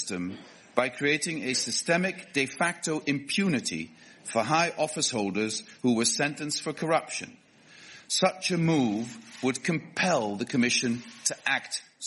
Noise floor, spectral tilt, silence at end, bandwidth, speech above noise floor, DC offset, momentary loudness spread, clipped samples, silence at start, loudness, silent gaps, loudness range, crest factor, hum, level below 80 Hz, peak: -53 dBFS; -3.5 dB/octave; 0 s; 11.5 kHz; 25 dB; under 0.1%; 11 LU; under 0.1%; 0 s; -28 LUFS; none; 2 LU; 22 dB; none; -70 dBFS; -8 dBFS